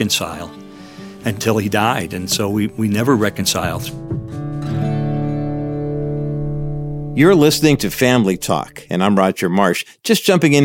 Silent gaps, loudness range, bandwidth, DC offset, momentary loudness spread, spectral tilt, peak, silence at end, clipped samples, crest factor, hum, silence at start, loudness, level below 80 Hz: none; 6 LU; 17 kHz; under 0.1%; 13 LU; -5 dB/octave; 0 dBFS; 0 s; under 0.1%; 16 dB; none; 0 s; -17 LUFS; -40 dBFS